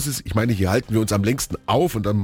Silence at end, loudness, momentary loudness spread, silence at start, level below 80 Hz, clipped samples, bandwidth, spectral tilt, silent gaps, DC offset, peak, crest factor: 0 s; -21 LUFS; 3 LU; 0 s; -40 dBFS; under 0.1%; 18.5 kHz; -5.5 dB/octave; none; under 0.1%; -6 dBFS; 14 dB